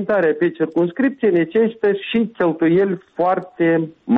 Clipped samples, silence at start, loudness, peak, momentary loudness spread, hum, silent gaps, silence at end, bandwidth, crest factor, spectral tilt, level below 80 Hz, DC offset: under 0.1%; 0 s; -18 LUFS; -6 dBFS; 4 LU; none; none; 0 s; 4.2 kHz; 10 dB; -9.5 dB/octave; -60 dBFS; under 0.1%